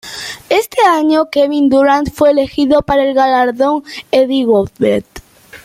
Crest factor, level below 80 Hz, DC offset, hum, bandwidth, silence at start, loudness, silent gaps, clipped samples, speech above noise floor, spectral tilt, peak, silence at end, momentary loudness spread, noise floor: 12 dB; -42 dBFS; under 0.1%; none; 16 kHz; 0.05 s; -12 LUFS; none; under 0.1%; 24 dB; -5 dB/octave; -2 dBFS; 0.05 s; 5 LU; -35 dBFS